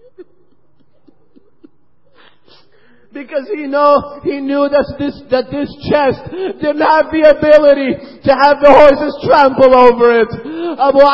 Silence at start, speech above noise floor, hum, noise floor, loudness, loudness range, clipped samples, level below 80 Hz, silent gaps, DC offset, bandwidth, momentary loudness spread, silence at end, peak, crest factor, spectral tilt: 0.2 s; 47 dB; none; -57 dBFS; -11 LUFS; 10 LU; 0.7%; -42 dBFS; none; under 0.1%; 7.6 kHz; 15 LU; 0 s; 0 dBFS; 12 dB; -7 dB/octave